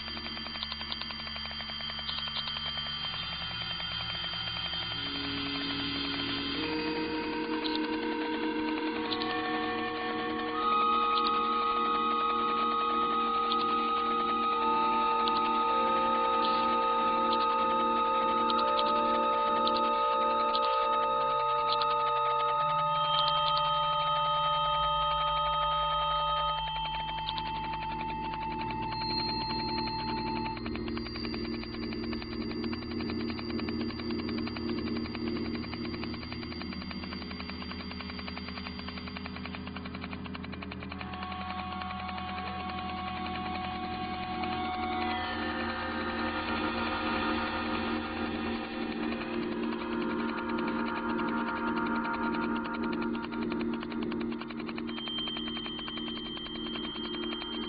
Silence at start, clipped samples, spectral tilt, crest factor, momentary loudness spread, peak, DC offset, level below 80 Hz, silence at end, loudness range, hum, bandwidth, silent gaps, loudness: 0 s; under 0.1%; -2 dB/octave; 18 dB; 10 LU; -12 dBFS; under 0.1%; -52 dBFS; 0 s; 10 LU; none; 5.2 kHz; none; -31 LUFS